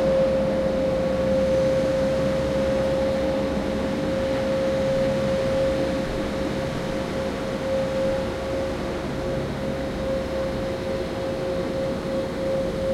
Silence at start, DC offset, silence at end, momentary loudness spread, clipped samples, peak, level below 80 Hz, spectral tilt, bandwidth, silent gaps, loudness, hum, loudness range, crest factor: 0 s; under 0.1%; 0 s; 6 LU; under 0.1%; -10 dBFS; -38 dBFS; -6.5 dB/octave; 13.5 kHz; none; -24 LUFS; none; 4 LU; 14 dB